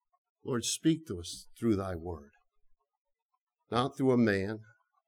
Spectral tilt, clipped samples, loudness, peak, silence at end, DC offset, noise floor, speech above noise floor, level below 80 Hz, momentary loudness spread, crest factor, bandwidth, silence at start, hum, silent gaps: -5 dB/octave; under 0.1%; -32 LUFS; -14 dBFS; 0.45 s; under 0.1%; -85 dBFS; 53 dB; -62 dBFS; 16 LU; 20 dB; 17 kHz; 0.45 s; none; 2.98-3.05 s, 3.22-3.29 s, 3.41-3.47 s